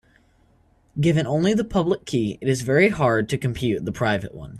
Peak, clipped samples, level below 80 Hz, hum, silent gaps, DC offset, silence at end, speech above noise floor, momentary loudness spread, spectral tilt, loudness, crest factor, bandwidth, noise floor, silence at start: -4 dBFS; under 0.1%; -48 dBFS; none; none; under 0.1%; 0 s; 38 dB; 7 LU; -6.5 dB/octave; -22 LUFS; 18 dB; 13 kHz; -59 dBFS; 0.95 s